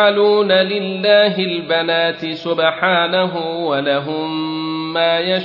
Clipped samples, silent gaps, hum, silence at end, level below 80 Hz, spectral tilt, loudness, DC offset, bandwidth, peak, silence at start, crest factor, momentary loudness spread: under 0.1%; none; none; 0 s; -64 dBFS; -7 dB/octave; -16 LUFS; under 0.1%; 6 kHz; -2 dBFS; 0 s; 14 dB; 9 LU